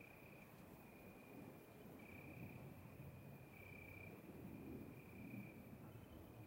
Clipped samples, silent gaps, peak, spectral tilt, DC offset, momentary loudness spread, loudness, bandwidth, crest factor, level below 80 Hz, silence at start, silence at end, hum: under 0.1%; none; -42 dBFS; -7 dB/octave; under 0.1%; 6 LU; -59 LUFS; 16 kHz; 16 dB; -74 dBFS; 0 s; 0 s; none